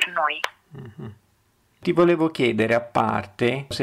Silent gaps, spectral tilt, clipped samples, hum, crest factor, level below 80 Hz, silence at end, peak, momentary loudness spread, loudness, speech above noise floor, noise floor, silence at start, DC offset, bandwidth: none; -5.5 dB/octave; under 0.1%; none; 16 dB; -58 dBFS; 0 s; -8 dBFS; 21 LU; -22 LUFS; 42 dB; -64 dBFS; 0 s; under 0.1%; 13.5 kHz